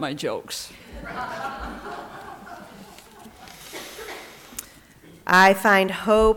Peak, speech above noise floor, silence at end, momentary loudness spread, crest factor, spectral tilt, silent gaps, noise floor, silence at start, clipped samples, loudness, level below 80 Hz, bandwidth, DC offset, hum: -6 dBFS; 29 dB; 0 s; 26 LU; 18 dB; -4 dB/octave; none; -49 dBFS; 0 s; under 0.1%; -20 LUFS; -44 dBFS; 19 kHz; under 0.1%; none